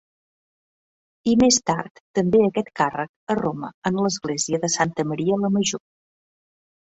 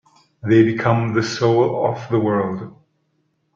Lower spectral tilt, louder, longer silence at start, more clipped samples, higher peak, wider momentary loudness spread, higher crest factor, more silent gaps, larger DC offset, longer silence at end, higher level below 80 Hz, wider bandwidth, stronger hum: second, -4 dB/octave vs -7 dB/octave; second, -22 LUFS vs -18 LUFS; first, 1.25 s vs 0.45 s; neither; second, -6 dBFS vs -2 dBFS; second, 10 LU vs 13 LU; about the same, 18 dB vs 16 dB; first, 1.91-2.14 s, 3.09-3.27 s, 3.74-3.82 s vs none; neither; first, 1.15 s vs 0.85 s; about the same, -56 dBFS vs -58 dBFS; about the same, 8.2 kHz vs 7.6 kHz; neither